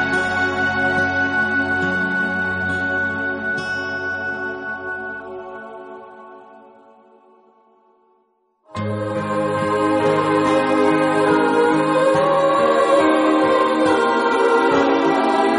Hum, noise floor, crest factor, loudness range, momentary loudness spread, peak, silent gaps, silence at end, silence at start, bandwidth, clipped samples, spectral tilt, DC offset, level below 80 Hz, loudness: none; -63 dBFS; 16 dB; 16 LU; 12 LU; -4 dBFS; none; 0 s; 0 s; 10.5 kHz; under 0.1%; -5.5 dB/octave; under 0.1%; -56 dBFS; -18 LUFS